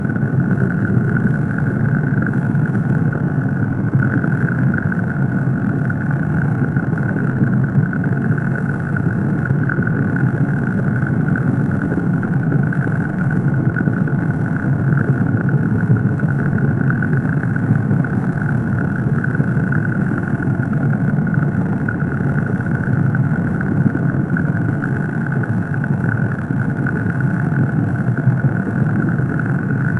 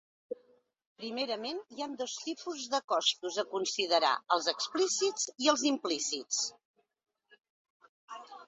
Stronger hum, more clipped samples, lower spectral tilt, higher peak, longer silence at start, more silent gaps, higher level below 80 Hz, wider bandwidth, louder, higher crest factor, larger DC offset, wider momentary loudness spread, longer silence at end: neither; neither; first, -10.5 dB/octave vs -0.5 dB/octave; first, 0 dBFS vs -12 dBFS; second, 0 s vs 0.3 s; second, none vs 0.86-0.96 s, 2.84-2.88 s, 6.65-6.74 s, 7.50-7.80 s, 7.89-8.08 s; first, -42 dBFS vs -84 dBFS; second, 3.1 kHz vs 8.2 kHz; first, -18 LUFS vs -32 LUFS; second, 16 dB vs 22 dB; neither; second, 3 LU vs 17 LU; about the same, 0 s vs 0 s